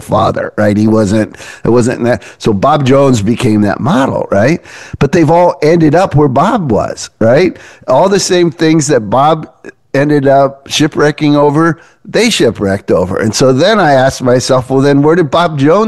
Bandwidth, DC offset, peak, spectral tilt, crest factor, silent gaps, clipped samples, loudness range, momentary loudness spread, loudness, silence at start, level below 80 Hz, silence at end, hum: 12.5 kHz; 1%; 0 dBFS; -5.5 dB/octave; 8 dB; none; under 0.1%; 1 LU; 6 LU; -10 LUFS; 0 s; -40 dBFS; 0 s; none